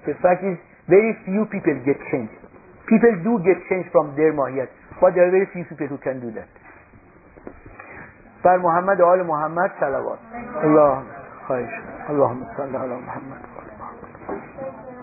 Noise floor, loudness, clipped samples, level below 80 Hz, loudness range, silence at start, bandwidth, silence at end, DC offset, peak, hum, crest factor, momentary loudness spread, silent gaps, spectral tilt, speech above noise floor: -49 dBFS; -20 LUFS; under 0.1%; -56 dBFS; 8 LU; 0.05 s; 2.7 kHz; 0 s; under 0.1%; 0 dBFS; none; 20 dB; 21 LU; none; -15 dB/octave; 29 dB